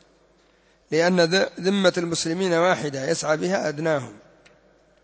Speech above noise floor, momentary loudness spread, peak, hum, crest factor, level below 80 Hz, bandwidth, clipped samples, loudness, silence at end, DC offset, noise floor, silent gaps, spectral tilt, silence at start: 38 dB; 6 LU; -6 dBFS; none; 18 dB; -64 dBFS; 8 kHz; under 0.1%; -22 LUFS; 0.85 s; under 0.1%; -60 dBFS; none; -4.5 dB/octave; 0.9 s